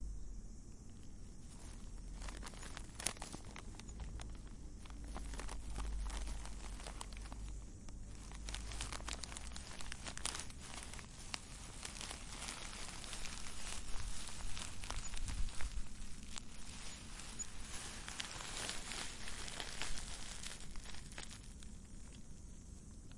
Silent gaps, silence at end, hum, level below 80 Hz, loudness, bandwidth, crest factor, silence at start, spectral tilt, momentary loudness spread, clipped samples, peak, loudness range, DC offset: none; 0 s; none; -50 dBFS; -48 LUFS; 11.5 kHz; 32 dB; 0 s; -2.5 dB/octave; 12 LU; under 0.1%; -12 dBFS; 4 LU; under 0.1%